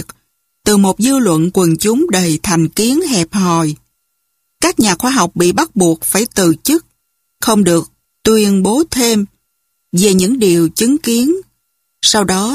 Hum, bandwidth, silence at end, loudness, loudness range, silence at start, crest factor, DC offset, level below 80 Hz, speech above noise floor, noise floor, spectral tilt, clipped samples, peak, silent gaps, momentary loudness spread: none; 15.5 kHz; 0 s; -13 LUFS; 2 LU; 0 s; 14 dB; under 0.1%; -44 dBFS; 55 dB; -67 dBFS; -4 dB/octave; under 0.1%; 0 dBFS; none; 6 LU